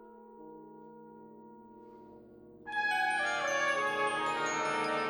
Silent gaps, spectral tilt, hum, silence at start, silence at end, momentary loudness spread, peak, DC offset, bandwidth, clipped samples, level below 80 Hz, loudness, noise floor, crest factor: none; -2 dB/octave; none; 0 s; 0 s; 24 LU; -18 dBFS; under 0.1%; over 20 kHz; under 0.1%; -74 dBFS; -31 LUFS; -54 dBFS; 16 dB